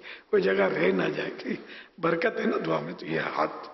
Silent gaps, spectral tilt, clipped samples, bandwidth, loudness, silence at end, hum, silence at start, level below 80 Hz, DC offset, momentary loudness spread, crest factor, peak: none; -7 dB/octave; under 0.1%; 6 kHz; -28 LUFS; 0 s; none; 0.05 s; -68 dBFS; under 0.1%; 11 LU; 16 dB; -12 dBFS